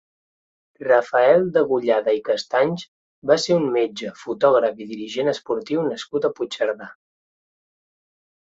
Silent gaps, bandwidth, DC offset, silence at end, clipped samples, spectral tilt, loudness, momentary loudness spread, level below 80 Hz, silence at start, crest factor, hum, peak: 2.88-3.22 s; 8 kHz; under 0.1%; 1.65 s; under 0.1%; -5 dB/octave; -21 LUFS; 14 LU; -68 dBFS; 0.8 s; 18 dB; none; -4 dBFS